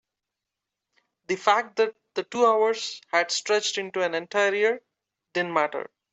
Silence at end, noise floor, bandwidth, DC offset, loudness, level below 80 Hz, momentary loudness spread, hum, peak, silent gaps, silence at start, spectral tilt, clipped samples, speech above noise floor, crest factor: 0.25 s; -86 dBFS; 8.2 kHz; under 0.1%; -25 LUFS; -78 dBFS; 10 LU; none; -6 dBFS; none; 1.3 s; -2 dB/octave; under 0.1%; 62 dB; 20 dB